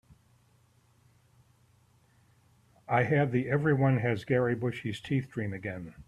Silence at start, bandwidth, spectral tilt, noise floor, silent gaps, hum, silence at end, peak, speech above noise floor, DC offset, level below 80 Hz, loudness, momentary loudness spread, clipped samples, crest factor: 2.9 s; 10.5 kHz; -8.5 dB/octave; -65 dBFS; none; none; 0.05 s; -14 dBFS; 37 dB; under 0.1%; -64 dBFS; -29 LUFS; 10 LU; under 0.1%; 18 dB